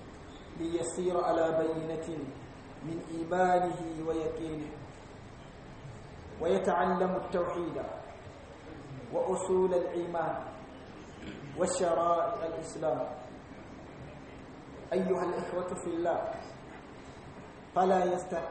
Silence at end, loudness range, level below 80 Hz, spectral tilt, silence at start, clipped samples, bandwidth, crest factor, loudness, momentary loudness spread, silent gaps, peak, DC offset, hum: 0 s; 4 LU; -58 dBFS; -6 dB/octave; 0 s; under 0.1%; 8.4 kHz; 18 dB; -32 LUFS; 20 LU; none; -14 dBFS; under 0.1%; none